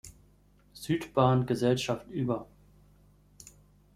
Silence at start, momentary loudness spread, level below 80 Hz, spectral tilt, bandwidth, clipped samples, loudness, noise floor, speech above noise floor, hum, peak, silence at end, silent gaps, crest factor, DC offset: 0.05 s; 9 LU; -58 dBFS; -6.5 dB/octave; 15 kHz; under 0.1%; -29 LUFS; -62 dBFS; 34 dB; 50 Hz at -55 dBFS; -10 dBFS; 0.45 s; none; 22 dB; under 0.1%